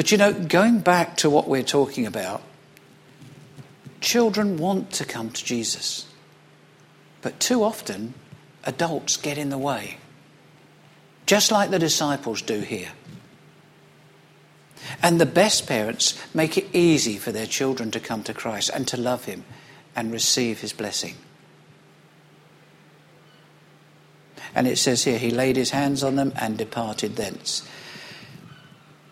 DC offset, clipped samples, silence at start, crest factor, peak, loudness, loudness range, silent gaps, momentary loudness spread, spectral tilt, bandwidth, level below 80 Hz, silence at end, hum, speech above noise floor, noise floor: under 0.1%; under 0.1%; 0 s; 22 dB; -2 dBFS; -23 LUFS; 7 LU; none; 16 LU; -3.5 dB/octave; 16 kHz; -62 dBFS; 0.65 s; none; 30 dB; -53 dBFS